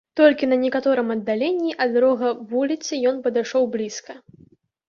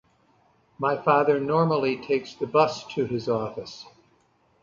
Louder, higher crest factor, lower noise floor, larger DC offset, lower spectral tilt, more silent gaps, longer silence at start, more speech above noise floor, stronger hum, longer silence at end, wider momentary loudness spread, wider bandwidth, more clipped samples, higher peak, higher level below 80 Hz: first, -21 LUFS vs -24 LUFS; about the same, 18 dB vs 20 dB; second, -54 dBFS vs -64 dBFS; neither; second, -4 dB/octave vs -6.5 dB/octave; neither; second, 0.15 s vs 0.8 s; second, 34 dB vs 40 dB; neither; about the same, 0.7 s vs 0.8 s; second, 7 LU vs 12 LU; about the same, 7.4 kHz vs 7.6 kHz; neither; about the same, -4 dBFS vs -6 dBFS; about the same, -68 dBFS vs -64 dBFS